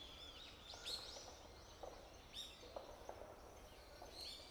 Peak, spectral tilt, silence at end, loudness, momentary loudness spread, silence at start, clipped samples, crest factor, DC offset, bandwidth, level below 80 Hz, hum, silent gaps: -34 dBFS; -2.5 dB/octave; 0 s; -54 LUFS; 12 LU; 0 s; under 0.1%; 22 dB; under 0.1%; over 20 kHz; -66 dBFS; none; none